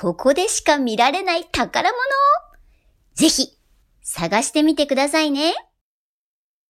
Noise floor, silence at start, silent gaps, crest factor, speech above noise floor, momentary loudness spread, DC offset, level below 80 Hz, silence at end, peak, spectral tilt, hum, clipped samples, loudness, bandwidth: under -90 dBFS; 0 s; none; 18 dB; over 72 dB; 9 LU; under 0.1%; -50 dBFS; 1.1 s; -4 dBFS; -2.5 dB/octave; none; under 0.1%; -18 LUFS; 15.5 kHz